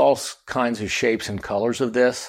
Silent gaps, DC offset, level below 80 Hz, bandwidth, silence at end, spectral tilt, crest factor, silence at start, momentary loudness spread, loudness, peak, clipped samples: none; under 0.1%; -54 dBFS; 16 kHz; 0 s; -4 dB/octave; 16 dB; 0 s; 6 LU; -23 LUFS; -6 dBFS; under 0.1%